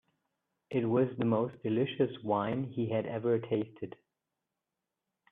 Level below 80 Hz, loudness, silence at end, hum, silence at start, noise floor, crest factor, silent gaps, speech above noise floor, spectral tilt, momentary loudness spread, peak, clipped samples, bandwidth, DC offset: -74 dBFS; -32 LUFS; 1.4 s; none; 0.7 s; -88 dBFS; 18 dB; none; 57 dB; -10 dB/octave; 6 LU; -16 dBFS; under 0.1%; 4 kHz; under 0.1%